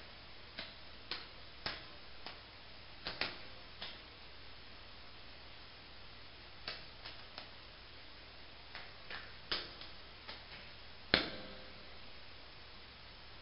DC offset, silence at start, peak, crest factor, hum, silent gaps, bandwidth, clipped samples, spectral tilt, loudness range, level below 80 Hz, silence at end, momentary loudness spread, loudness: 0.1%; 0 s; -8 dBFS; 42 dB; none; none; 5.6 kHz; under 0.1%; -1 dB/octave; 10 LU; -62 dBFS; 0 s; 13 LU; -46 LUFS